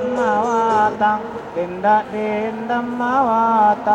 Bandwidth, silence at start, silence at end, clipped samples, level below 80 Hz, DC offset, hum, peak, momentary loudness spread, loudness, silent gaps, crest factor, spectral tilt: 8.4 kHz; 0 s; 0 s; under 0.1%; -56 dBFS; under 0.1%; none; -4 dBFS; 8 LU; -18 LUFS; none; 14 dB; -6 dB/octave